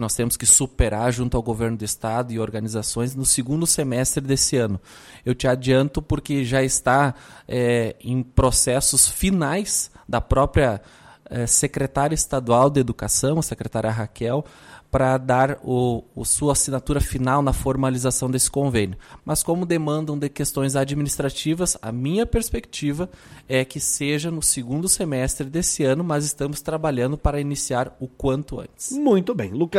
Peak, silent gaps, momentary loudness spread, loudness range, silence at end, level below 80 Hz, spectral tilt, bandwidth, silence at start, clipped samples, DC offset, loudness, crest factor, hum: -2 dBFS; none; 9 LU; 4 LU; 0 s; -36 dBFS; -4 dB/octave; 16 kHz; 0 s; under 0.1%; under 0.1%; -21 LUFS; 20 dB; none